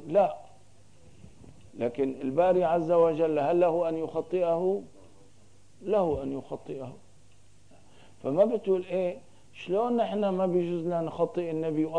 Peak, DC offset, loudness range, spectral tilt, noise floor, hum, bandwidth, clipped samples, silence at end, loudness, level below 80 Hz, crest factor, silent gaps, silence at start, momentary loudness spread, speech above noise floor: -12 dBFS; 0.3%; 7 LU; -8 dB/octave; -60 dBFS; none; 10 kHz; under 0.1%; 0 s; -28 LUFS; -62 dBFS; 18 dB; none; 0 s; 14 LU; 33 dB